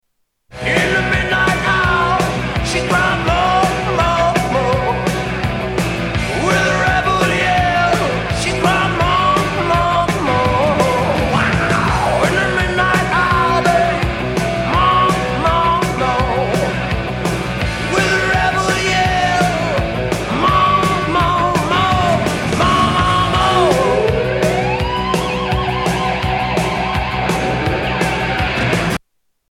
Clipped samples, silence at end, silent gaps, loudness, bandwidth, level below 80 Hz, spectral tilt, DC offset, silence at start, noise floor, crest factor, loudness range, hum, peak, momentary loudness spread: under 0.1%; 0.55 s; none; -15 LUFS; 16.5 kHz; -30 dBFS; -5 dB/octave; under 0.1%; 0.5 s; -61 dBFS; 14 dB; 3 LU; none; 0 dBFS; 5 LU